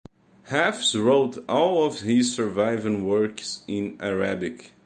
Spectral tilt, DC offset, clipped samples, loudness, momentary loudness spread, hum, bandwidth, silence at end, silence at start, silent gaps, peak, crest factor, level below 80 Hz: -4 dB/octave; under 0.1%; under 0.1%; -24 LUFS; 9 LU; none; 10 kHz; 0.2 s; 0.45 s; none; -6 dBFS; 18 dB; -60 dBFS